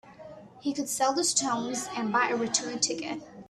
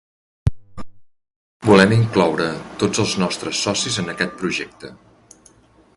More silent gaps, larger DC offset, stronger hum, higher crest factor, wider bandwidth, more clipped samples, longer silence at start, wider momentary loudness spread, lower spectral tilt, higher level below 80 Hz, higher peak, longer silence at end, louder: second, none vs 1.36-1.60 s; neither; neither; about the same, 22 dB vs 20 dB; first, 15 kHz vs 11.5 kHz; neither; second, 0.05 s vs 0.45 s; about the same, 12 LU vs 12 LU; second, -1.5 dB/octave vs -4.5 dB/octave; second, -70 dBFS vs -40 dBFS; second, -8 dBFS vs 0 dBFS; second, 0.05 s vs 1 s; second, -28 LUFS vs -19 LUFS